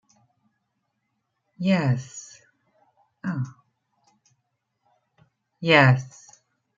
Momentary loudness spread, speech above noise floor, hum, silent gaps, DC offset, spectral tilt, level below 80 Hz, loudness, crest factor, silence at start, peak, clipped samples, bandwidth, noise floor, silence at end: 24 LU; 56 dB; none; none; under 0.1%; -6 dB/octave; -68 dBFS; -22 LUFS; 24 dB; 1.6 s; -2 dBFS; under 0.1%; 7.6 kHz; -77 dBFS; 0.7 s